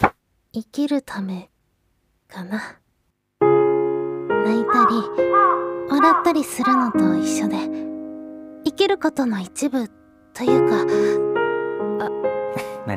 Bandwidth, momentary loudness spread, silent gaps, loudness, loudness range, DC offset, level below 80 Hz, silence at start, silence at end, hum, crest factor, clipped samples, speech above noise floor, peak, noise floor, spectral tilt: 16 kHz; 16 LU; none; -20 LUFS; 6 LU; under 0.1%; -56 dBFS; 0 s; 0 s; none; 20 dB; under 0.1%; 50 dB; 0 dBFS; -69 dBFS; -5.5 dB/octave